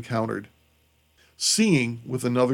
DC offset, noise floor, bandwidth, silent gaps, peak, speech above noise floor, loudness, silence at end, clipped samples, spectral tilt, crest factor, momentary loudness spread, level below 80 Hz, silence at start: under 0.1%; -64 dBFS; 17 kHz; none; -8 dBFS; 40 dB; -24 LUFS; 0 s; under 0.1%; -4 dB/octave; 16 dB; 10 LU; -64 dBFS; 0 s